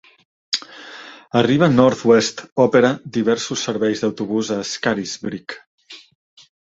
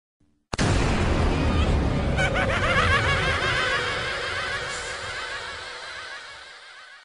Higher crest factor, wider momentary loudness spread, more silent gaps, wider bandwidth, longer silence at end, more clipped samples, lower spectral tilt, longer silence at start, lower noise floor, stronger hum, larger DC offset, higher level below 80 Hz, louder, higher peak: about the same, 18 dB vs 16 dB; first, 19 LU vs 15 LU; first, 2.52-2.56 s, 5.67-5.78 s vs none; second, 8 kHz vs 10.5 kHz; first, 0.65 s vs 0.05 s; neither; about the same, -5 dB/octave vs -4.5 dB/octave; about the same, 0.5 s vs 0.5 s; second, -39 dBFS vs -45 dBFS; neither; neither; second, -58 dBFS vs -32 dBFS; first, -18 LUFS vs -24 LUFS; first, 0 dBFS vs -10 dBFS